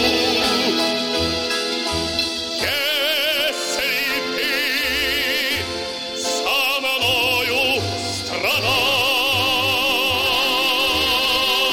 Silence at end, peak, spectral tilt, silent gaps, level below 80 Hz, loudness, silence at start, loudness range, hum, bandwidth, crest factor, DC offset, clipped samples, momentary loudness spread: 0 s; -6 dBFS; -2 dB/octave; none; -48 dBFS; -18 LUFS; 0 s; 3 LU; none; 17.5 kHz; 14 dB; under 0.1%; under 0.1%; 5 LU